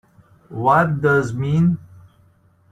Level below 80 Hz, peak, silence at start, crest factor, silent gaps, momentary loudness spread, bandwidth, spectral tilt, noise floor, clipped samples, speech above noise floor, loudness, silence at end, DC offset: -54 dBFS; -4 dBFS; 0.5 s; 16 dB; none; 9 LU; 9 kHz; -8.5 dB/octave; -55 dBFS; under 0.1%; 38 dB; -18 LUFS; 0.9 s; under 0.1%